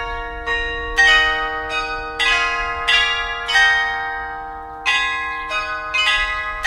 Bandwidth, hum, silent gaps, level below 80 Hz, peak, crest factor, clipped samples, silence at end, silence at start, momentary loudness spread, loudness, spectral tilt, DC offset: 14 kHz; none; none; -36 dBFS; -2 dBFS; 18 dB; under 0.1%; 0 s; 0 s; 12 LU; -17 LUFS; -1 dB/octave; under 0.1%